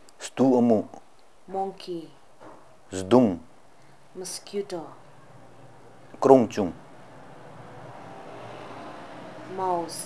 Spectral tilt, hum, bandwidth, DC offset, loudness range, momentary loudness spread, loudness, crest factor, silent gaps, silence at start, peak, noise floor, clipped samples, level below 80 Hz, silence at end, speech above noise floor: -6 dB/octave; none; 12 kHz; 0.3%; 7 LU; 26 LU; -25 LUFS; 26 dB; none; 0.2 s; 0 dBFS; -55 dBFS; under 0.1%; -68 dBFS; 0 s; 32 dB